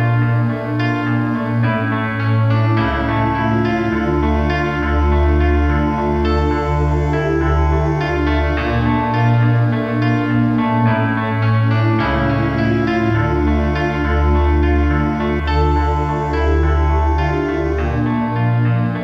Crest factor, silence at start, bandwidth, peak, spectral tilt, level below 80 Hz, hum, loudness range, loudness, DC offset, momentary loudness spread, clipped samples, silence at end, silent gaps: 12 dB; 0 s; 6.4 kHz; -4 dBFS; -8.5 dB/octave; -22 dBFS; none; 1 LU; -17 LUFS; under 0.1%; 3 LU; under 0.1%; 0 s; none